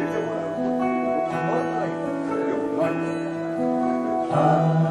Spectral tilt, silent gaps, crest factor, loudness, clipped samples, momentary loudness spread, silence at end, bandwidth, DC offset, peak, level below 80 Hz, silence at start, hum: -8 dB/octave; none; 16 dB; -24 LUFS; under 0.1%; 7 LU; 0 s; 10.5 kHz; under 0.1%; -8 dBFS; -60 dBFS; 0 s; none